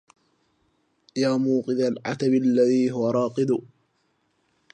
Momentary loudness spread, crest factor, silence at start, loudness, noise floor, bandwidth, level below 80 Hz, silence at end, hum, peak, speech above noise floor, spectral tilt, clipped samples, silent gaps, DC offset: 6 LU; 16 dB; 1.15 s; -23 LUFS; -70 dBFS; 9.4 kHz; -74 dBFS; 1.15 s; none; -10 dBFS; 48 dB; -6.5 dB/octave; under 0.1%; none; under 0.1%